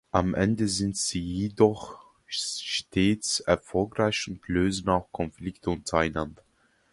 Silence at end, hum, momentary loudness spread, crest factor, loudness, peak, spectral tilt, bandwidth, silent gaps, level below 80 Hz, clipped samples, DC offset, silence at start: 0.6 s; none; 10 LU; 22 dB; -27 LUFS; -6 dBFS; -4.5 dB/octave; 11.5 kHz; none; -46 dBFS; under 0.1%; under 0.1%; 0.15 s